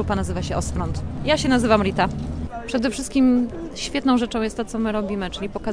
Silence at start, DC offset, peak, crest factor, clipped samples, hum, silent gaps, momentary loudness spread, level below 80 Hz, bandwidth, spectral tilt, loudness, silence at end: 0 s; under 0.1%; -2 dBFS; 20 dB; under 0.1%; none; none; 10 LU; -36 dBFS; 10.5 kHz; -5.5 dB/octave; -22 LUFS; 0 s